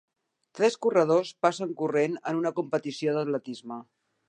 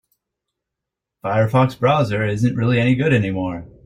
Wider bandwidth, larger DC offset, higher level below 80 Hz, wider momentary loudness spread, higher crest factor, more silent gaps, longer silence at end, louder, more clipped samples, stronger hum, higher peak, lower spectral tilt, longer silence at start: about the same, 9.6 kHz vs 10.5 kHz; neither; second, -82 dBFS vs -50 dBFS; first, 13 LU vs 8 LU; about the same, 20 dB vs 16 dB; neither; first, 0.45 s vs 0.2 s; second, -27 LUFS vs -18 LUFS; neither; neither; second, -8 dBFS vs -4 dBFS; second, -5.5 dB/octave vs -7.5 dB/octave; second, 0.55 s vs 1.25 s